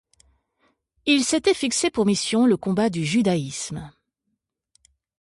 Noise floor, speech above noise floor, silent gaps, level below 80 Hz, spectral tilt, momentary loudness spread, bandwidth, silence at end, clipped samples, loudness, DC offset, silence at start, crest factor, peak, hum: -78 dBFS; 57 dB; none; -58 dBFS; -4 dB/octave; 10 LU; 11.5 kHz; 1.3 s; under 0.1%; -22 LUFS; under 0.1%; 1.05 s; 18 dB; -6 dBFS; none